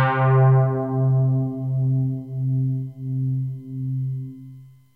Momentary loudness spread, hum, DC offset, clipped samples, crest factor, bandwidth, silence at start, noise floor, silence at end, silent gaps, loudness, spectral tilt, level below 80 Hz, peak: 13 LU; none; under 0.1%; under 0.1%; 14 dB; 3.5 kHz; 0 s; -44 dBFS; 0.25 s; none; -22 LUFS; -11 dB/octave; -58 dBFS; -8 dBFS